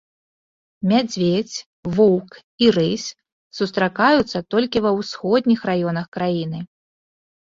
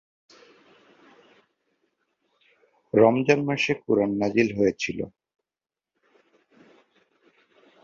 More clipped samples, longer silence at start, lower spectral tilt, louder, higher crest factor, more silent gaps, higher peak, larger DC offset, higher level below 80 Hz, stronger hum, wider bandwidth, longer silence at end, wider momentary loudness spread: neither; second, 0.8 s vs 2.95 s; about the same, -5.5 dB/octave vs -6 dB/octave; first, -20 LUFS vs -23 LUFS; second, 18 dB vs 24 dB; first, 1.66-1.83 s, 2.44-2.58 s, 3.32-3.51 s, 6.08-6.12 s vs none; about the same, -2 dBFS vs -4 dBFS; neither; first, -56 dBFS vs -64 dBFS; neither; about the same, 7.6 kHz vs 7.4 kHz; second, 0.9 s vs 2.75 s; about the same, 13 LU vs 11 LU